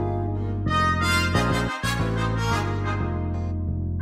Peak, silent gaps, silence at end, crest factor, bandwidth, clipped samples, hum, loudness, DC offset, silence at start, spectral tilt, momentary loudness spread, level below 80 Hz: -10 dBFS; none; 0 s; 14 dB; 16 kHz; under 0.1%; none; -24 LUFS; under 0.1%; 0 s; -5.5 dB/octave; 7 LU; -34 dBFS